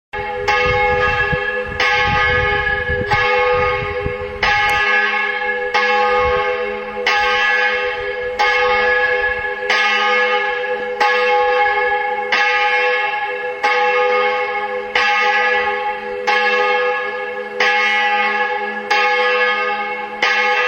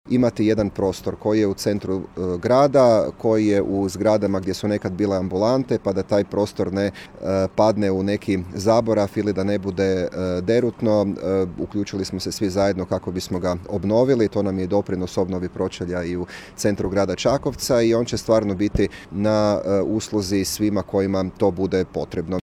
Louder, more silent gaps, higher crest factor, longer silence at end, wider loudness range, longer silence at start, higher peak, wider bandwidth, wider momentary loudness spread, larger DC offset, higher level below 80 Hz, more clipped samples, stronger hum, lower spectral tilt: first, -16 LUFS vs -21 LUFS; neither; about the same, 16 dB vs 16 dB; second, 0 s vs 0.15 s; about the same, 1 LU vs 3 LU; about the same, 0.15 s vs 0.05 s; first, 0 dBFS vs -4 dBFS; about the same, 16 kHz vs 15.5 kHz; about the same, 7 LU vs 7 LU; neither; first, -38 dBFS vs -44 dBFS; neither; neither; second, -3.5 dB/octave vs -6 dB/octave